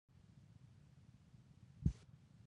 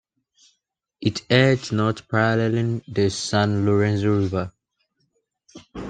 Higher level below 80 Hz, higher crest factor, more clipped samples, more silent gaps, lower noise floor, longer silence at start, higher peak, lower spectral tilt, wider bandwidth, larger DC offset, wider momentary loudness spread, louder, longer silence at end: about the same, -56 dBFS vs -56 dBFS; first, 28 dB vs 20 dB; neither; neither; second, -65 dBFS vs -74 dBFS; second, 0.3 s vs 1 s; second, -22 dBFS vs -2 dBFS; first, -8.5 dB/octave vs -6 dB/octave; about the same, 9.6 kHz vs 9.4 kHz; neither; first, 22 LU vs 9 LU; second, -45 LUFS vs -21 LUFS; about the same, 0 s vs 0 s